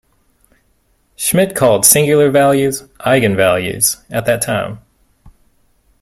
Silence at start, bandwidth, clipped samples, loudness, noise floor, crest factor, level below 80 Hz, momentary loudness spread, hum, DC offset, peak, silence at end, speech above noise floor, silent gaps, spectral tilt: 1.2 s; 16.5 kHz; under 0.1%; -13 LUFS; -58 dBFS; 16 dB; -48 dBFS; 11 LU; none; under 0.1%; 0 dBFS; 0.7 s; 46 dB; none; -3.5 dB/octave